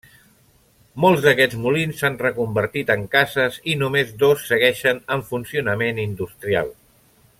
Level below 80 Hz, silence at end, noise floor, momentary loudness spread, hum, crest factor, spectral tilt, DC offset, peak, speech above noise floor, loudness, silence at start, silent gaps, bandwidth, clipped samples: -54 dBFS; 0.65 s; -56 dBFS; 9 LU; none; 20 dB; -5 dB/octave; under 0.1%; -2 dBFS; 37 dB; -20 LUFS; 0.95 s; none; 16.5 kHz; under 0.1%